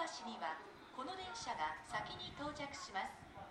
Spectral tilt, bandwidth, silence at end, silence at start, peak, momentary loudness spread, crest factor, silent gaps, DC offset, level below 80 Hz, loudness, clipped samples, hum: -3 dB/octave; 15.5 kHz; 0 s; 0 s; -28 dBFS; 7 LU; 18 dB; none; under 0.1%; -70 dBFS; -46 LUFS; under 0.1%; none